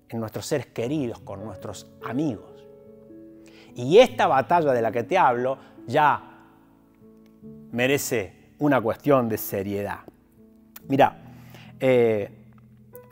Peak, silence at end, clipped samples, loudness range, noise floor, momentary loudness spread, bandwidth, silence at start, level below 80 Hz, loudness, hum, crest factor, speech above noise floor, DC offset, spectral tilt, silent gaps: -4 dBFS; 0.1 s; under 0.1%; 6 LU; -55 dBFS; 17 LU; 16 kHz; 0.1 s; -60 dBFS; -23 LUFS; none; 22 dB; 33 dB; under 0.1%; -5.5 dB/octave; none